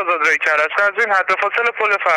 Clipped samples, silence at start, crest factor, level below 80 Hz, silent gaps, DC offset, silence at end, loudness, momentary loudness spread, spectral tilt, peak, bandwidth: under 0.1%; 0 s; 14 dB; -70 dBFS; none; under 0.1%; 0 s; -15 LUFS; 2 LU; -1 dB/octave; -2 dBFS; 14 kHz